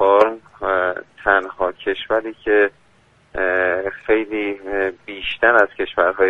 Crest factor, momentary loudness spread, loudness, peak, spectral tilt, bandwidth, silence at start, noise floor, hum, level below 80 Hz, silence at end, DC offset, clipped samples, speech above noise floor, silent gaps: 18 dB; 10 LU; -19 LUFS; 0 dBFS; -5.5 dB/octave; 6.8 kHz; 0 s; -55 dBFS; none; -48 dBFS; 0 s; under 0.1%; under 0.1%; 36 dB; none